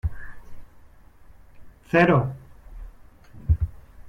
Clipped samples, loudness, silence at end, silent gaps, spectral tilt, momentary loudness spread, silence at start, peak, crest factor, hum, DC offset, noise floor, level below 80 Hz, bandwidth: under 0.1%; -23 LUFS; 0 s; none; -8.5 dB/octave; 28 LU; 0.05 s; -6 dBFS; 20 dB; none; under 0.1%; -49 dBFS; -36 dBFS; 7.4 kHz